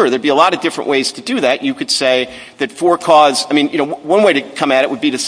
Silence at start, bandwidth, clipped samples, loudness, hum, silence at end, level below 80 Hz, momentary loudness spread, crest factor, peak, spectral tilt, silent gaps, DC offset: 0 s; 11 kHz; 0.2%; -13 LUFS; none; 0 s; -60 dBFS; 8 LU; 14 dB; 0 dBFS; -3 dB/octave; none; under 0.1%